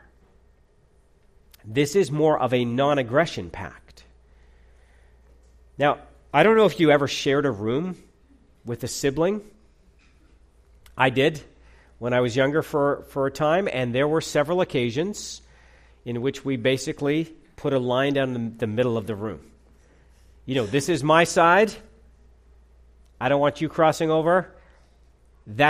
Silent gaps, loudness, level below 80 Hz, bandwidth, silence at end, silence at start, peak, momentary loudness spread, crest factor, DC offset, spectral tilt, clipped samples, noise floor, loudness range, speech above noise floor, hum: none; -23 LUFS; -54 dBFS; 15 kHz; 0 s; 1.65 s; -4 dBFS; 16 LU; 22 dB; under 0.1%; -5.5 dB/octave; under 0.1%; -59 dBFS; 5 LU; 36 dB; none